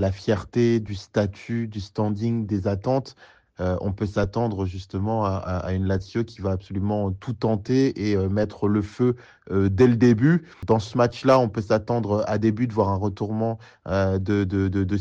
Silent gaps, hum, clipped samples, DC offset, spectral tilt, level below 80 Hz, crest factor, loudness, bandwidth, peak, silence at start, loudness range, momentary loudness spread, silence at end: none; none; under 0.1%; under 0.1%; -8 dB/octave; -50 dBFS; 16 dB; -24 LUFS; 7.6 kHz; -6 dBFS; 0 s; 6 LU; 9 LU; 0 s